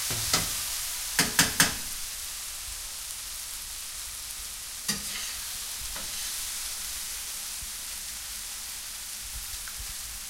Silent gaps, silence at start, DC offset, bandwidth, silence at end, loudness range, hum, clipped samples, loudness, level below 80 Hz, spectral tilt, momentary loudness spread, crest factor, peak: none; 0 s; under 0.1%; 16 kHz; 0 s; 7 LU; none; under 0.1%; -30 LUFS; -50 dBFS; -0.5 dB/octave; 11 LU; 28 dB; -4 dBFS